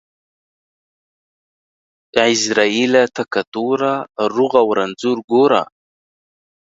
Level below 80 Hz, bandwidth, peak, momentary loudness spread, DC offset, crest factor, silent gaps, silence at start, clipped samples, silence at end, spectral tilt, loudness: -64 dBFS; 8 kHz; 0 dBFS; 7 LU; under 0.1%; 18 dB; 3.47-3.52 s, 5.24-5.28 s; 2.15 s; under 0.1%; 1.1 s; -3.5 dB/octave; -16 LUFS